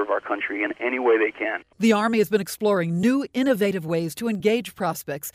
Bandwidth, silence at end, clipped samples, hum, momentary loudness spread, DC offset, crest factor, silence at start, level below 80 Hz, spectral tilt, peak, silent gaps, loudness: 16 kHz; 0.05 s; under 0.1%; none; 7 LU; under 0.1%; 16 dB; 0 s; -64 dBFS; -5.5 dB/octave; -6 dBFS; none; -23 LUFS